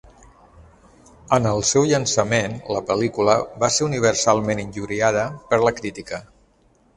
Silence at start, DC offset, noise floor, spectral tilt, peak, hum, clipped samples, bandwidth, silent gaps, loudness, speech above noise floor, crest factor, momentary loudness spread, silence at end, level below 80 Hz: 1.3 s; under 0.1%; -58 dBFS; -4 dB/octave; -2 dBFS; none; under 0.1%; 11.5 kHz; none; -20 LUFS; 38 dB; 20 dB; 10 LU; 0.7 s; -50 dBFS